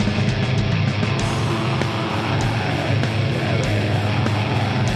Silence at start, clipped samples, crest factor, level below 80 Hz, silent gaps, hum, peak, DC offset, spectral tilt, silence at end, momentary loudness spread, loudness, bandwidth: 0 s; under 0.1%; 16 dB; -38 dBFS; none; none; -4 dBFS; under 0.1%; -6 dB/octave; 0 s; 1 LU; -20 LUFS; 12 kHz